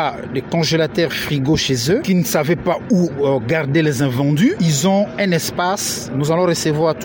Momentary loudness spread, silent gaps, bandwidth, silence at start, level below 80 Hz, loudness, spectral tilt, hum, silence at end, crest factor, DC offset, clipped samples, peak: 4 LU; none; 17 kHz; 0 s; -46 dBFS; -17 LUFS; -5 dB/octave; none; 0 s; 12 dB; under 0.1%; under 0.1%; -4 dBFS